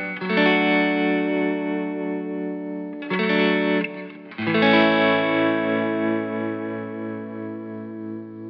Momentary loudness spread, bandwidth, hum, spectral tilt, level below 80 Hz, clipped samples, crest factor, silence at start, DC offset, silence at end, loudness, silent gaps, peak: 15 LU; 6 kHz; none; -8 dB/octave; -78 dBFS; under 0.1%; 18 dB; 0 s; under 0.1%; 0 s; -22 LUFS; none; -6 dBFS